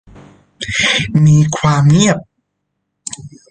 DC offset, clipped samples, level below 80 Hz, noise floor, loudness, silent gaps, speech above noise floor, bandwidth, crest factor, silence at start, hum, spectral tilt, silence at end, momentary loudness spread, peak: under 0.1%; under 0.1%; -42 dBFS; -72 dBFS; -12 LUFS; none; 60 dB; 9.6 kHz; 14 dB; 0.6 s; none; -5 dB/octave; 0.2 s; 18 LU; 0 dBFS